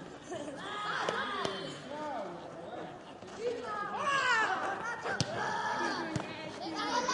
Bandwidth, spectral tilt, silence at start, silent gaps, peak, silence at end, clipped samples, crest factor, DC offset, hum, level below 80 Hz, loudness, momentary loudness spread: 11.5 kHz; -3.5 dB/octave; 0 s; none; -12 dBFS; 0 s; under 0.1%; 24 dB; under 0.1%; none; -70 dBFS; -35 LUFS; 14 LU